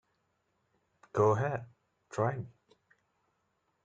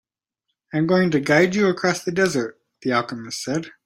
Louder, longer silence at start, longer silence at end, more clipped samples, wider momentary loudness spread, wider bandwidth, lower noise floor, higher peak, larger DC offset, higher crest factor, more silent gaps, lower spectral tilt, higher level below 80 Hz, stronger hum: second, -33 LUFS vs -21 LUFS; first, 1.15 s vs 0.75 s; first, 1.35 s vs 0.15 s; neither; first, 15 LU vs 12 LU; second, 8.8 kHz vs 15.5 kHz; about the same, -78 dBFS vs -79 dBFS; second, -14 dBFS vs -4 dBFS; neither; about the same, 22 dB vs 18 dB; neither; first, -8 dB/octave vs -5 dB/octave; second, -70 dBFS vs -60 dBFS; neither